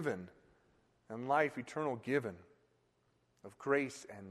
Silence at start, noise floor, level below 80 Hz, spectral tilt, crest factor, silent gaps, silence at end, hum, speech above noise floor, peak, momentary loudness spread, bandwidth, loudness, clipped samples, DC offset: 0 s; -76 dBFS; -80 dBFS; -6 dB/octave; 22 dB; none; 0 s; none; 38 dB; -18 dBFS; 23 LU; 13 kHz; -37 LUFS; under 0.1%; under 0.1%